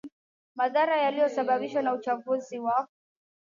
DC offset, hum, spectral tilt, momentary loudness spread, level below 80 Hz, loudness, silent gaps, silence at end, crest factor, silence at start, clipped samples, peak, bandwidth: under 0.1%; none; -4.5 dB/octave; 7 LU; -84 dBFS; -27 LUFS; 0.12-0.55 s; 0.6 s; 14 dB; 0.05 s; under 0.1%; -14 dBFS; 7.4 kHz